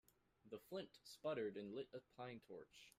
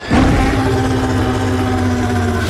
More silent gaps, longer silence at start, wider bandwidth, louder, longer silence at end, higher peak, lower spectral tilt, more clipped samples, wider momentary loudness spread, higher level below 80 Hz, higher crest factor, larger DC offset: neither; first, 0.45 s vs 0 s; first, 15.5 kHz vs 14 kHz; second, -52 LUFS vs -15 LUFS; about the same, 0.1 s vs 0 s; second, -36 dBFS vs -2 dBFS; about the same, -5.5 dB/octave vs -6.5 dB/octave; neither; first, 13 LU vs 3 LU; second, -86 dBFS vs -24 dBFS; first, 18 dB vs 12 dB; neither